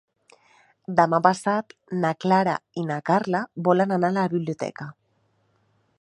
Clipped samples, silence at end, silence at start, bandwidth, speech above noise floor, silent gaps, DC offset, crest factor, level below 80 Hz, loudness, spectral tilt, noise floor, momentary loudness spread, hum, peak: under 0.1%; 1.1 s; 0.9 s; 11.5 kHz; 45 dB; none; under 0.1%; 22 dB; -70 dBFS; -23 LUFS; -7 dB/octave; -67 dBFS; 12 LU; none; -2 dBFS